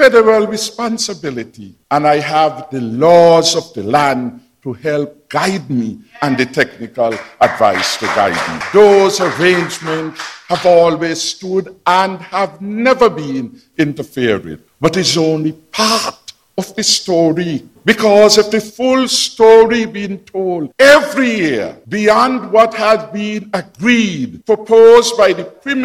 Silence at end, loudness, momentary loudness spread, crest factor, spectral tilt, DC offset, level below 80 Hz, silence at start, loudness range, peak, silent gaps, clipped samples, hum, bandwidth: 0 s; -13 LUFS; 14 LU; 12 dB; -4 dB/octave; under 0.1%; -52 dBFS; 0 s; 5 LU; 0 dBFS; none; 0.5%; none; 15.5 kHz